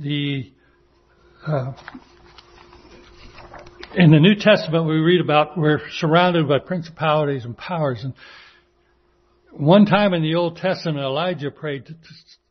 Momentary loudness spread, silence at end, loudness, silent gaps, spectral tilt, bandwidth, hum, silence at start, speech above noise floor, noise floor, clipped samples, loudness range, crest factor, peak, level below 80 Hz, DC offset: 16 LU; 0.55 s; -19 LUFS; none; -7.5 dB/octave; 6.4 kHz; none; 0 s; 42 dB; -61 dBFS; under 0.1%; 13 LU; 20 dB; 0 dBFS; -56 dBFS; under 0.1%